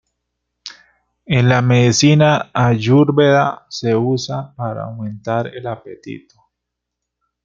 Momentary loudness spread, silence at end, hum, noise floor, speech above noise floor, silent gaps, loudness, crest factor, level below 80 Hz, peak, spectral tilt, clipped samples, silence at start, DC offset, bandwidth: 22 LU; 1.25 s; 60 Hz at -40 dBFS; -79 dBFS; 64 dB; none; -15 LUFS; 16 dB; -52 dBFS; -2 dBFS; -6 dB/octave; under 0.1%; 0.65 s; under 0.1%; 7.6 kHz